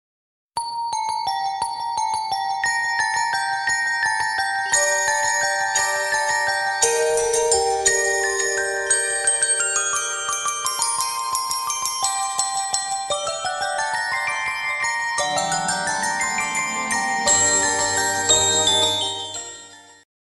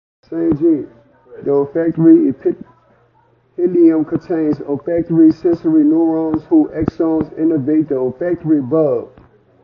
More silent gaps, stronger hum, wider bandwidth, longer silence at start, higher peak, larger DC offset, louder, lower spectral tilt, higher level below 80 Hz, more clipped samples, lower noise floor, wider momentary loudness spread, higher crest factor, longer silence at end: neither; neither; first, 15 kHz vs 5.2 kHz; first, 0.55 s vs 0.3 s; about the same, -2 dBFS vs 0 dBFS; neither; second, -20 LUFS vs -15 LUFS; second, 0.5 dB/octave vs -11.5 dB/octave; second, -56 dBFS vs -48 dBFS; neither; second, -43 dBFS vs -55 dBFS; about the same, 8 LU vs 9 LU; first, 20 dB vs 14 dB; second, 0.4 s vs 0.55 s